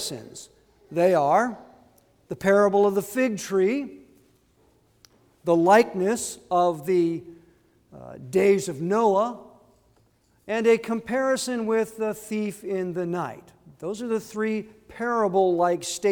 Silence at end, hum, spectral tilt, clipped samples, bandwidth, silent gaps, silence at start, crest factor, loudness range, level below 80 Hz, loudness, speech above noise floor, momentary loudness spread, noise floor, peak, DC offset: 0 s; none; -5 dB/octave; under 0.1%; 19.5 kHz; none; 0 s; 20 dB; 4 LU; -66 dBFS; -24 LUFS; 40 dB; 15 LU; -63 dBFS; -6 dBFS; under 0.1%